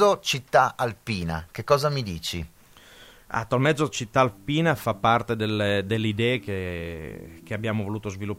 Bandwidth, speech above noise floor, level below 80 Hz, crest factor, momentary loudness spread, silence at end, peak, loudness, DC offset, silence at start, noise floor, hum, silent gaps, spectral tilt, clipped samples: 16 kHz; 26 dB; -52 dBFS; 20 dB; 12 LU; 0 s; -4 dBFS; -25 LUFS; under 0.1%; 0 s; -51 dBFS; none; none; -5 dB/octave; under 0.1%